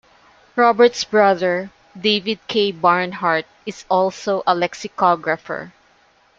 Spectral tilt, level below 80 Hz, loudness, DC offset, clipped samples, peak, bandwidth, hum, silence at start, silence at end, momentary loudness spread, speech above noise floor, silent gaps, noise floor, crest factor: -4 dB/octave; -62 dBFS; -18 LUFS; under 0.1%; under 0.1%; 0 dBFS; 7.8 kHz; none; 0.55 s; 0.7 s; 12 LU; 38 dB; none; -56 dBFS; 18 dB